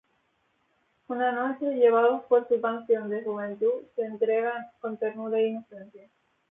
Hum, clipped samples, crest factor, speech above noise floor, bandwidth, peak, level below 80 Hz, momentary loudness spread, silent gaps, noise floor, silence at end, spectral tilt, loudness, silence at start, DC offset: none; under 0.1%; 18 dB; 45 dB; 3.8 kHz; -10 dBFS; -80 dBFS; 13 LU; none; -72 dBFS; 0.55 s; -9 dB/octave; -27 LUFS; 1.1 s; under 0.1%